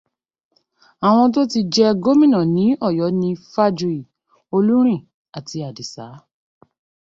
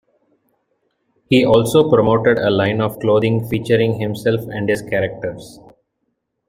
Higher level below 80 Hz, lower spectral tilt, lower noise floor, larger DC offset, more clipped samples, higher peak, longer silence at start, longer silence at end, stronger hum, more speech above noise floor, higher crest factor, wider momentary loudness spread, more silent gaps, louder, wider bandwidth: second, -60 dBFS vs -50 dBFS; about the same, -6.5 dB/octave vs -6.5 dB/octave; second, -57 dBFS vs -72 dBFS; neither; neither; about the same, -4 dBFS vs -2 dBFS; second, 1 s vs 1.3 s; about the same, 0.85 s vs 0.95 s; neither; second, 41 dB vs 56 dB; about the same, 16 dB vs 16 dB; first, 17 LU vs 8 LU; first, 5.14-5.25 s vs none; about the same, -17 LUFS vs -16 LUFS; second, 7.8 kHz vs 16 kHz